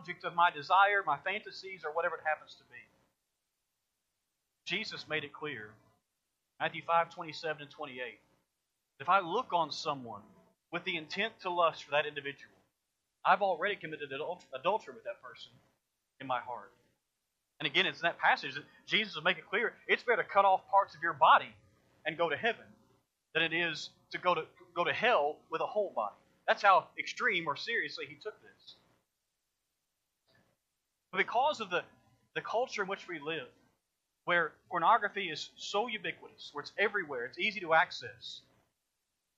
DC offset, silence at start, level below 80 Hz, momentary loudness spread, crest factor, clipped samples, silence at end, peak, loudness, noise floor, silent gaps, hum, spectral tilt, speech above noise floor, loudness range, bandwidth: under 0.1%; 0 s; -84 dBFS; 17 LU; 24 dB; under 0.1%; 1 s; -12 dBFS; -32 LUFS; -85 dBFS; none; none; -3.5 dB/octave; 52 dB; 10 LU; 8.2 kHz